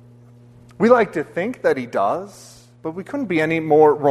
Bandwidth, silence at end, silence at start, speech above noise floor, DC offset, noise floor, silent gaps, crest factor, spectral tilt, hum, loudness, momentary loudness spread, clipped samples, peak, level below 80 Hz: 12.5 kHz; 0 s; 0.8 s; 28 dB; under 0.1%; -46 dBFS; none; 18 dB; -7 dB/octave; none; -19 LUFS; 16 LU; under 0.1%; 0 dBFS; -60 dBFS